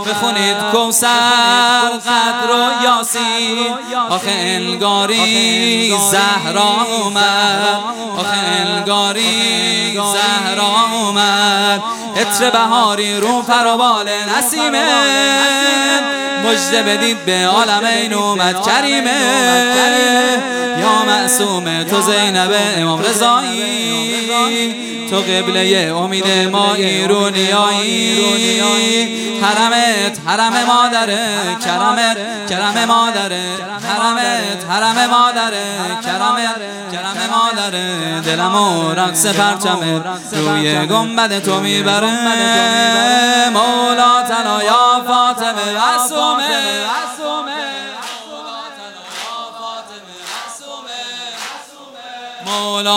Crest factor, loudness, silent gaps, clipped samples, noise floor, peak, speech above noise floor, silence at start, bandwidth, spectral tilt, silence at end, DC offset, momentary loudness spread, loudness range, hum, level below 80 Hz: 14 dB; -13 LUFS; none; under 0.1%; -35 dBFS; 0 dBFS; 21 dB; 0 s; 17 kHz; -2 dB/octave; 0 s; under 0.1%; 10 LU; 5 LU; none; -68 dBFS